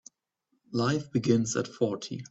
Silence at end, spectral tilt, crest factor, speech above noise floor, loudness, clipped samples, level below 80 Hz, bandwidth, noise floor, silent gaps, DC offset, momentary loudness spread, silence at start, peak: 0.05 s; -5.5 dB/octave; 18 dB; 49 dB; -29 LUFS; under 0.1%; -66 dBFS; 8.4 kHz; -77 dBFS; none; under 0.1%; 7 LU; 0.7 s; -10 dBFS